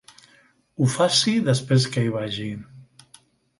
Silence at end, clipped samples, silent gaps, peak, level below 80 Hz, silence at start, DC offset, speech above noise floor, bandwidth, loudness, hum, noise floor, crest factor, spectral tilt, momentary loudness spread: 0.75 s; under 0.1%; none; -4 dBFS; -60 dBFS; 0.8 s; under 0.1%; 37 dB; 11.5 kHz; -22 LUFS; none; -58 dBFS; 20 dB; -5 dB/octave; 15 LU